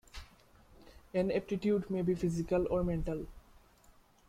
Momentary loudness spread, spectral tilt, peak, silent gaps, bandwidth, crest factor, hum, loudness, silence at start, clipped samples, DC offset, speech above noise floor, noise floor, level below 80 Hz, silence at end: 13 LU; -8 dB/octave; -20 dBFS; none; 14.5 kHz; 16 dB; none; -34 LUFS; 0.15 s; under 0.1%; under 0.1%; 31 dB; -63 dBFS; -50 dBFS; 0.9 s